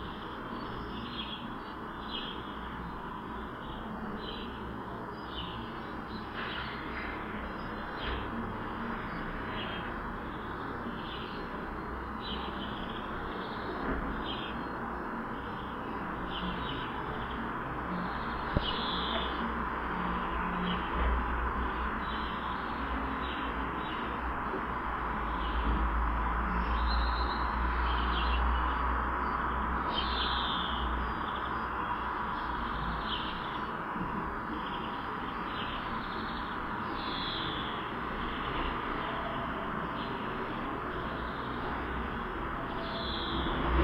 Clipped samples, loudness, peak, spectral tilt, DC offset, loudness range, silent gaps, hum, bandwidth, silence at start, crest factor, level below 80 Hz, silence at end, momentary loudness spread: under 0.1%; -35 LUFS; -12 dBFS; -7 dB/octave; under 0.1%; 7 LU; none; none; 5.8 kHz; 0 s; 22 dB; -40 dBFS; 0 s; 8 LU